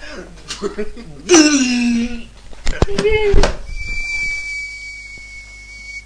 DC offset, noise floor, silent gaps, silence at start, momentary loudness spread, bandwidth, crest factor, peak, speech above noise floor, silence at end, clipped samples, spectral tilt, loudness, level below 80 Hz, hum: under 0.1%; -35 dBFS; none; 0 s; 21 LU; 10.5 kHz; 16 dB; 0 dBFS; 22 dB; 0.05 s; under 0.1%; -3.5 dB/octave; -17 LUFS; -24 dBFS; 50 Hz at -45 dBFS